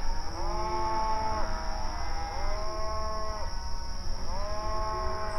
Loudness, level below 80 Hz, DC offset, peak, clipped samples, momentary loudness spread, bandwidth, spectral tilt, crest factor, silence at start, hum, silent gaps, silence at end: -34 LUFS; -32 dBFS; under 0.1%; -16 dBFS; under 0.1%; 8 LU; 11.5 kHz; -4.5 dB/octave; 12 dB; 0 s; none; none; 0 s